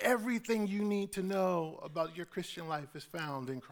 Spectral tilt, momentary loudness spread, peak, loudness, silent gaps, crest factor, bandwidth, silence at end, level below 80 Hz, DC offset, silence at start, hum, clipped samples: -5.5 dB/octave; 9 LU; -18 dBFS; -36 LUFS; none; 18 dB; over 20 kHz; 0 s; -70 dBFS; under 0.1%; 0 s; none; under 0.1%